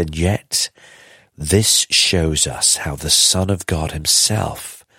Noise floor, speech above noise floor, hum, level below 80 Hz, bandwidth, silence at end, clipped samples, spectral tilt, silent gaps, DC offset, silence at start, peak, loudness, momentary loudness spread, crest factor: -46 dBFS; 29 dB; none; -36 dBFS; 16.5 kHz; 0.2 s; under 0.1%; -2.5 dB/octave; none; under 0.1%; 0 s; 0 dBFS; -15 LUFS; 10 LU; 18 dB